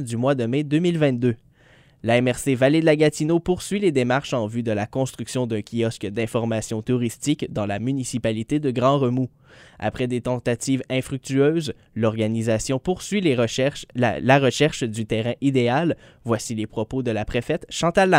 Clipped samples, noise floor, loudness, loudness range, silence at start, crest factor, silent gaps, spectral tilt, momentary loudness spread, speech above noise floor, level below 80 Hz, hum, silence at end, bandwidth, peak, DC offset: under 0.1%; -54 dBFS; -22 LUFS; 4 LU; 0 s; 20 dB; none; -5.5 dB/octave; 8 LU; 32 dB; -50 dBFS; none; 0 s; 16 kHz; -2 dBFS; under 0.1%